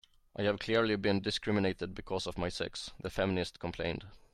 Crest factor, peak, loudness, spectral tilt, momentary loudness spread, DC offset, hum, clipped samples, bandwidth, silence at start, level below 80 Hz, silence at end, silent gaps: 18 dB; -16 dBFS; -34 LUFS; -5.5 dB/octave; 9 LU; under 0.1%; none; under 0.1%; 13 kHz; 0.35 s; -54 dBFS; 0.15 s; none